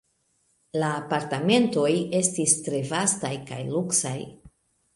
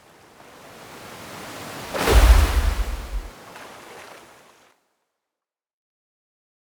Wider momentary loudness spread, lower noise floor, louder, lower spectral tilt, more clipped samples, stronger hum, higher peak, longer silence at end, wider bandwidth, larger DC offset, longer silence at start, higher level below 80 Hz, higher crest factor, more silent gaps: second, 11 LU vs 26 LU; second, -70 dBFS vs -88 dBFS; second, -24 LUFS vs -21 LUFS; about the same, -4 dB/octave vs -4.5 dB/octave; neither; neither; about the same, -4 dBFS vs -2 dBFS; second, 0.45 s vs 2.65 s; second, 11.5 kHz vs over 20 kHz; neither; second, 0.75 s vs 0.9 s; second, -66 dBFS vs -24 dBFS; about the same, 22 dB vs 22 dB; neither